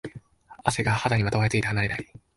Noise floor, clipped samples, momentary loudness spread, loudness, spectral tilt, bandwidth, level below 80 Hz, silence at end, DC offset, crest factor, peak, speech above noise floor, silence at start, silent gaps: -47 dBFS; under 0.1%; 8 LU; -25 LUFS; -5 dB/octave; 11.5 kHz; -48 dBFS; 0.35 s; under 0.1%; 22 dB; -4 dBFS; 23 dB; 0.05 s; none